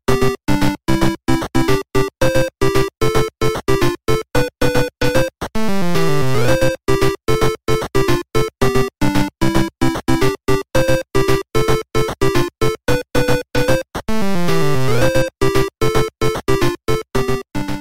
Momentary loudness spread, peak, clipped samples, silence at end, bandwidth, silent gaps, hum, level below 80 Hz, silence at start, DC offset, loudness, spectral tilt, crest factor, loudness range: 3 LU; 0 dBFS; under 0.1%; 0 s; 16.5 kHz; none; none; -30 dBFS; 0 s; 6%; -18 LUFS; -5.5 dB/octave; 14 dB; 1 LU